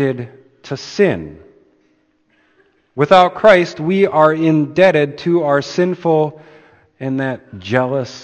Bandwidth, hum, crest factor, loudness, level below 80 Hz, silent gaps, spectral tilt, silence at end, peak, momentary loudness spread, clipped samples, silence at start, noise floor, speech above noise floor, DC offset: 8.8 kHz; none; 16 dB; -15 LUFS; -54 dBFS; none; -6.5 dB/octave; 0 s; 0 dBFS; 17 LU; under 0.1%; 0 s; -59 dBFS; 45 dB; under 0.1%